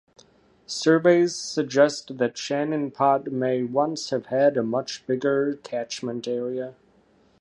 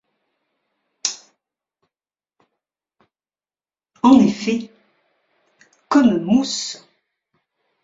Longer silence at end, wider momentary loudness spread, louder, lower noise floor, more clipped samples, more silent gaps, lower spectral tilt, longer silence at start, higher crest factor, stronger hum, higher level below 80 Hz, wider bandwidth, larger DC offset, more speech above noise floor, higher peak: second, 0.7 s vs 1.05 s; second, 11 LU vs 19 LU; second, -24 LUFS vs -18 LUFS; second, -60 dBFS vs under -90 dBFS; neither; neither; about the same, -5 dB/octave vs -4.5 dB/octave; second, 0.7 s vs 1.05 s; about the same, 20 dB vs 22 dB; neither; second, -70 dBFS vs -60 dBFS; first, 11.5 kHz vs 7.8 kHz; neither; second, 37 dB vs over 72 dB; second, -4 dBFS vs 0 dBFS